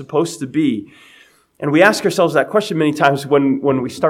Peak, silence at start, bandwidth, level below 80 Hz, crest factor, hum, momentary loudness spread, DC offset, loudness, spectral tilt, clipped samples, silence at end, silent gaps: 0 dBFS; 0 s; 16 kHz; -62 dBFS; 16 dB; none; 7 LU; under 0.1%; -16 LUFS; -5.5 dB/octave; under 0.1%; 0 s; none